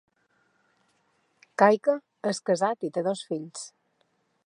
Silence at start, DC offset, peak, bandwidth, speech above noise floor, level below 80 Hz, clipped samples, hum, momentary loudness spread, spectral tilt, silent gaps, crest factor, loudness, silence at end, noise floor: 1.6 s; under 0.1%; -4 dBFS; 11 kHz; 46 dB; -84 dBFS; under 0.1%; none; 18 LU; -5 dB/octave; none; 24 dB; -26 LUFS; 0.8 s; -71 dBFS